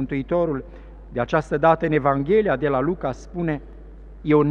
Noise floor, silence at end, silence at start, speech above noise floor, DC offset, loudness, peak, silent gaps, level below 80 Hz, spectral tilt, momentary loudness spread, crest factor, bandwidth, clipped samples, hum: -40 dBFS; 0 s; 0 s; 19 dB; under 0.1%; -22 LUFS; -4 dBFS; none; -42 dBFS; -8.5 dB/octave; 12 LU; 18 dB; 8.2 kHz; under 0.1%; none